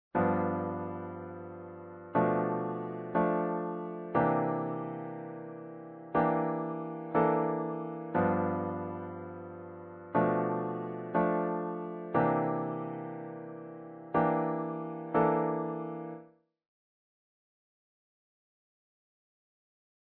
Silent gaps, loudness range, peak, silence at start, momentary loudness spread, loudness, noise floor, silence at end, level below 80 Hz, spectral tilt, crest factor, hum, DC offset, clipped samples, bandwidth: none; 2 LU; -14 dBFS; 0.15 s; 16 LU; -32 LUFS; -57 dBFS; 3.85 s; -68 dBFS; -11.5 dB/octave; 20 dB; none; under 0.1%; under 0.1%; 4.2 kHz